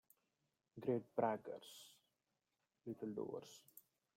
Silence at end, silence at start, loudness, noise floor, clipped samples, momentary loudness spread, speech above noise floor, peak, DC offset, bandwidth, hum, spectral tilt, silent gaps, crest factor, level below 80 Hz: 0.35 s; 0.75 s; -45 LUFS; -89 dBFS; under 0.1%; 22 LU; 45 dB; -24 dBFS; under 0.1%; 16 kHz; none; -6 dB/octave; none; 24 dB; -88 dBFS